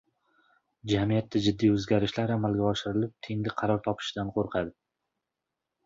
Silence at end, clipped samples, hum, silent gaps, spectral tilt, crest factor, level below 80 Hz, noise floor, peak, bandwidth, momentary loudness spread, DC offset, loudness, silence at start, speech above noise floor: 1.15 s; under 0.1%; none; none; -6.5 dB/octave; 18 dB; -54 dBFS; -86 dBFS; -12 dBFS; 7.8 kHz; 8 LU; under 0.1%; -29 LUFS; 0.85 s; 59 dB